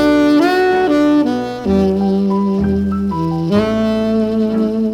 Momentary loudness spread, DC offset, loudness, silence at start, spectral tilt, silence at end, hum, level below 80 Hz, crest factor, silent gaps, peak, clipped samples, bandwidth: 6 LU; under 0.1%; -15 LUFS; 0 s; -7.5 dB/octave; 0 s; none; -40 dBFS; 12 dB; none; -2 dBFS; under 0.1%; 14 kHz